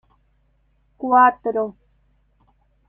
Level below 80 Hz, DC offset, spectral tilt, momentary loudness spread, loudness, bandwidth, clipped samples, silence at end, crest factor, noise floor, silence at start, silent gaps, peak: -62 dBFS; under 0.1%; -8 dB/octave; 15 LU; -18 LUFS; 3 kHz; under 0.1%; 1.15 s; 20 dB; -62 dBFS; 1 s; none; -2 dBFS